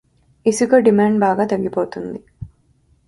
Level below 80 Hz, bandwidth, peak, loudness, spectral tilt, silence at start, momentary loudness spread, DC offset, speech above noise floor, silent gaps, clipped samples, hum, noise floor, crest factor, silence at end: -50 dBFS; 11.5 kHz; 0 dBFS; -17 LUFS; -6 dB/octave; 0.45 s; 23 LU; under 0.1%; 42 dB; none; under 0.1%; none; -58 dBFS; 18 dB; 0.6 s